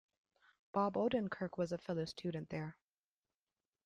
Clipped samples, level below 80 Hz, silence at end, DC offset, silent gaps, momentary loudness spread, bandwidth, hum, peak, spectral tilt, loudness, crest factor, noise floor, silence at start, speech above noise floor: under 0.1%; -74 dBFS; 1.15 s; under 0.1%; none; 9 LU; 10.5 kHz; none; -24 dBFS; -7 dB/octave; -40 LUFS; 18 dB; under -90 dBFS; 0.75 s; over 51 dB